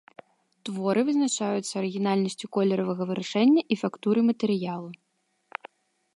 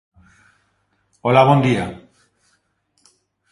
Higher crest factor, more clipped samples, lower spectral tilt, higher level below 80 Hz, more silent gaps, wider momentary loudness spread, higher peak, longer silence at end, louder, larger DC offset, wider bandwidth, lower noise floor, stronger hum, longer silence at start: second, 14 dB vs 22 dB; neither; second, -5.5 dB/octave vs -7.5 dB/octave; second, -78 dBFS vs -52 dBFS; neither; first, 18 LU vs 13 LU; second, -12 dBFS vs 0 dBFS; second, 1.2 s vs 1.55 s; second, -26 LUFS vs -16 LUFS; neither; about the same, 11.5 kHz vs 11.5 kHz; second, -60 dBFS vs -66 dBFS; neither; second, 0.65 s vs 1.25 s